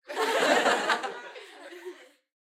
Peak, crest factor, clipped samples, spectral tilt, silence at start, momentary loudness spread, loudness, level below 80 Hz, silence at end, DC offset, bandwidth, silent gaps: -8 dBFS; 22 dB; under 0.1%; -1.5 dB/octave; 0.1 s; 22 LU; -25 LUFS; under -90 dBFS; 0.45 s; under 0.1%; 16.5 kHz; none